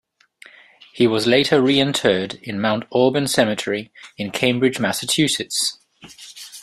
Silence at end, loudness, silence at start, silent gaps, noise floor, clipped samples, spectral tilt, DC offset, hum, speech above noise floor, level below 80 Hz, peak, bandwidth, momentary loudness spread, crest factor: 0 s; -19 LUFS; 0.95 s; none; -49 dBFS; under 0.1%; -4 dB/octave; under 0.1%; none; 30 dB; -58 dBFS; -2 dBFS; 15 kHz; 14 LU; 18 dB